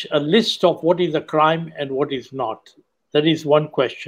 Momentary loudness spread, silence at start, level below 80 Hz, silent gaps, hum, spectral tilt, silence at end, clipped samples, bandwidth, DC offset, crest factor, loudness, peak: 10 LU; 0 s; -66 dBFS; none; none; -6 dB/octave; 0 s; under 0.1%; 15 kHz; under 0.1%; 18 dB; -19 LUFS; -2 dBFS